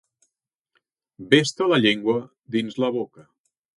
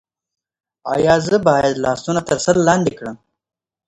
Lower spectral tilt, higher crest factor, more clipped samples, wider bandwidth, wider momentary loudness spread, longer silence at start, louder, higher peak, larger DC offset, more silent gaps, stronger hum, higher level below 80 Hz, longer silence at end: about the same, -4.5 dB/octave vs -5 dB/octave; about the same, 22 dB vs 18 dB; neither; about the same, 11.5 kHz vs 11 kHz; second, 10 LU vs 13 LU; first, 1.2 s vs 0.85 s; second, -22 LUFS vs -16 LUFS; about the same, -2 dBFS vs 0 dBFS; neither; neither; neither; second, -68 dBFS vs -48 dBFS; second, 0.55 s vs 0.7 s